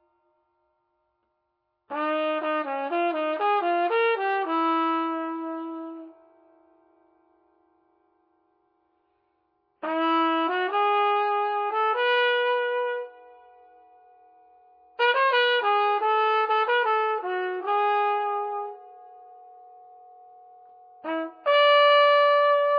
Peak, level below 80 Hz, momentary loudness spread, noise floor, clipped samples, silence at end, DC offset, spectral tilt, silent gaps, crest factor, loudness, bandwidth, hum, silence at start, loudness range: -8 dBFS; -90 dBFS; 14 LU; -77 dBFS; under 0.1%; 0 s; under 0.1%; -3 dB/octave; none; 18 dB; -23 LUFS; 5.4 kHz; none; 1.9 s; 10 LU